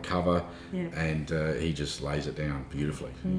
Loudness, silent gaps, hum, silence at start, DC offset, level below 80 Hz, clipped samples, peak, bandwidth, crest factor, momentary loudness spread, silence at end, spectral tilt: -32 LUFS; none; none; 0 s; under 0.1%; -44 dBFS; under 0.1%; -14 dBFS; 10.5 kHz; 18 dB; 7 LU; 0 s; -6 dB/octave